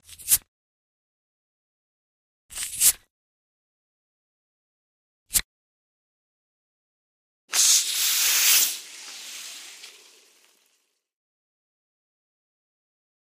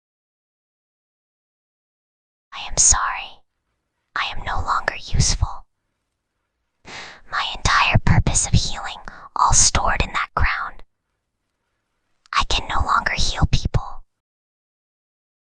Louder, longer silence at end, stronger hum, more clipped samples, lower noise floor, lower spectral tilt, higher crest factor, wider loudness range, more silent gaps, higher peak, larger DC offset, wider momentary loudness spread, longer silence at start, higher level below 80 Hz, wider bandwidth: about the same, -20 LUFS vs -19 LUFS; first, 3.35 s vs 1.4 s; neither; neither; second, -71 dBFS vs -76 dBFS; second, 3.5 dB/octave vs -2.5 dB/octave; about the same, 26 dB vs 22 dB; first, 12 LU vs 7 LU; first, 0.48-2.49 s, 3.10-5.26 s, 5.44-7.48 s vs none; about the same, -2 dBFS vs -2 dBFS; neither; about the same, 21 LU vs 19 LU; second, 0.1 s vs 2.5 s; second, -58 dBFS vs -28 dBFS; first, 15.5 kHz vs 10 kHz